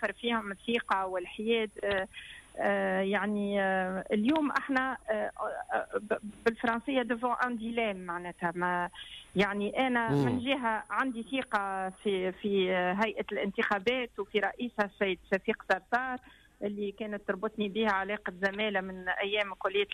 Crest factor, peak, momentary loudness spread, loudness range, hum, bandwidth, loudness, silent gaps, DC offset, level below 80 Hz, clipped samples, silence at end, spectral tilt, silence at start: 16 dB; -16 dBFS; 7 LU; 2 LU; none; 13 kHz; -32 LUFS; none; under 0.1%; -62 dBFS; under 0.1%; 0 s; -6 dB/octave; 0 s